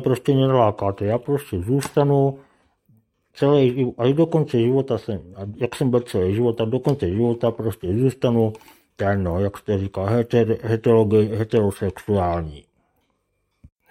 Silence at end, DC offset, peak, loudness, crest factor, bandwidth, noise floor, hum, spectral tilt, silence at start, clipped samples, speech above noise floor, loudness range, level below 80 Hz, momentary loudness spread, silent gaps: 1.3 s; under 0.1%; -4 dBFS; -21 LUFS; 18 dB; 15.5 kHz; -71 dBFS; none; -8 dB/octave; 0 s; under 0.1%; 51 dB; 2 LU; -52 dBFS; 8 LU; none